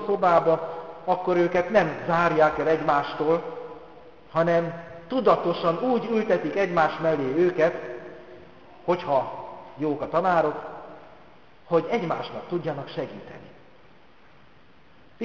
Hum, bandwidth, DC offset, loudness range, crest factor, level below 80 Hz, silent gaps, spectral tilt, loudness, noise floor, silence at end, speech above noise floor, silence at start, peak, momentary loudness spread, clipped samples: none; 7.2 kHz; 0.3%; 7 LU; 20 dB; -60 dBFS; none; -7.5 dB/octave; -24 LUFS; -56 dBFS; 0 s; 32 dB; 0 s; -6 dBFS; 18 LU; under 0.1%